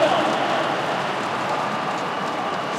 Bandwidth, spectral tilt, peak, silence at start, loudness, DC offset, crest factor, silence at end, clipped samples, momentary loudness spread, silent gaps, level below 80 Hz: 15.5 kHz; -4 dB/octave; -6 dBFS; 0 s; -23 LUFS; under 0.1%; 18 dB; 0 s; under 0.1%; 5 LU; none; -68 dBFS